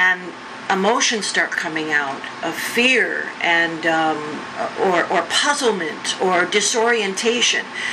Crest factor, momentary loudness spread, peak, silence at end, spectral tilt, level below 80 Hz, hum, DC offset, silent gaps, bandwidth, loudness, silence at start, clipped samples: 18 dB; 10 LU; -2 dBFS; 0 s; -2 dB/octave; -66 dBFS; none; under 0.1%; none; 13 kHz; -18 LUFS; 0 s; under 0.1%